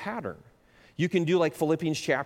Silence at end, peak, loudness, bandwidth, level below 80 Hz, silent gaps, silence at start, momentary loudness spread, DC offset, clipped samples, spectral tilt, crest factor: 0 s; -12 dBFS; -27 LUFS; 16.5 kHz; -66 dBFS; none; 0 s; 13 LU; under 0.1%; under 0.1%; -6 dB/octave; 16 dB